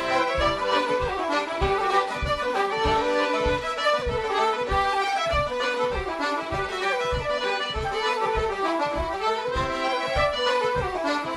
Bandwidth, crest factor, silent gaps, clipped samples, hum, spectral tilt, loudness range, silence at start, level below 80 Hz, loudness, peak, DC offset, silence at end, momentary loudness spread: 13.5 kHz; 16 dB; none; under 0.1%; none; -4 dB/octave; 2 LU; 0 s; -38 dBFS; -25 LUFS; -8 dBFS; under 0.1%; 0 s; 4 LU